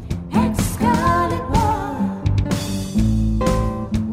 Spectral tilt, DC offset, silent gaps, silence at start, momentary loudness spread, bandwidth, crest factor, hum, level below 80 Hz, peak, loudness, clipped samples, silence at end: -6.5 dB/octave; under 0.1%; none; 0 s; 5 LU; 16 kHz; 14 dB; none; -28 dBFS; -4 dBFS; -20 LUFS; under 0.1%; 0 s